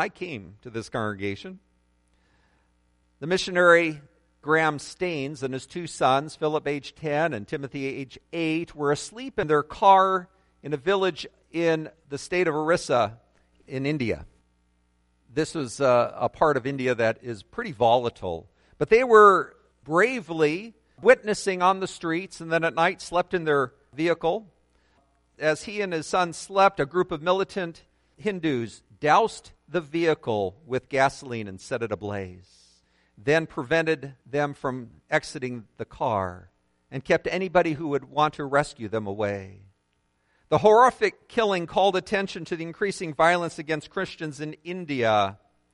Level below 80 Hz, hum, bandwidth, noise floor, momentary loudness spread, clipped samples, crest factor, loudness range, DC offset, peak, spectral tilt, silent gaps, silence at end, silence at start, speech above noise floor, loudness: -58 dBFS; none; 11.5 kHz; -71 dBFS; 14 LU; under 0.1%; 22 dB; 7 LU; under 0.1%; -4 dBFS; -5 dB/octave; none; 0.4 s; 0 s; 47 dB; -25 LUFS